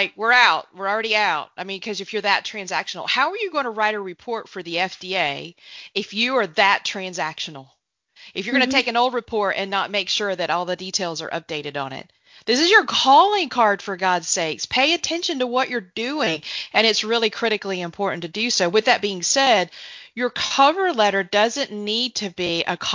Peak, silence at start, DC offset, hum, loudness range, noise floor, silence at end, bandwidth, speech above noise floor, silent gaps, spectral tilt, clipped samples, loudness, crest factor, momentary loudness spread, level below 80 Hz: 0 dBFS; 0 s; under 0.1%; none; 5 LU; -52 dBFS; 0 s; 7.6 kHz; 31 dB; none; -2 dB/octave; under 0.1%; -20 LUFS; 20 dB; 13 LU; -64 dBFS